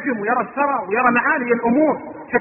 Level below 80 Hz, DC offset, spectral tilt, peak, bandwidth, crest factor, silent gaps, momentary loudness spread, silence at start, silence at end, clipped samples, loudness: -58 dBFS; under 0.1%; -11.5 dB/octave; -2 dBFS; 3 kHz; 16 dB; none; 5 LU; 0 s; 0 s; under 0.1%; -18 LUFS